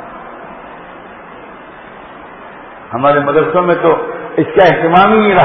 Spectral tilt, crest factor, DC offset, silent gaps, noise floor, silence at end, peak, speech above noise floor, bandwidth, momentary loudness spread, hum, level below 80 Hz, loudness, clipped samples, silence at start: -8 dB/octave; 14 dB; under 0.1%; none; -33 dBFS; 0 s; 0 dBFS; 23 dB; 6 kHz; 24 LU; none; -46 dBFS; -11 LUFS; under 0.1%; 0 s